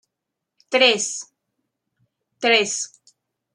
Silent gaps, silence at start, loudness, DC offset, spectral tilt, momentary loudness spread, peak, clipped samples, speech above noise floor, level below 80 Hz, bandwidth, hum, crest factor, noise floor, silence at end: none; 0.7 s; -19 LUFS; under 0.1%; -0.5 dB/octave; 14 LU; -2 dBFS; under 0.1%; 63 dB; -78 dBFS; 11.5 kHz; none; 22 dB; -82 dBFS; 0.7 s